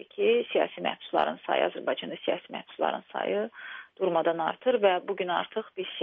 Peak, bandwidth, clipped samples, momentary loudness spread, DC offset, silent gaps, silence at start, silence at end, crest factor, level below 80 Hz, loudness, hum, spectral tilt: -10 dBFS; 4.4 kHz; under 0.1%; 10 LU; under 0.1%; none; 0 s; 0 s; 20 dB; -78 dBFS; -29 LUFS; none; -2 dB/octave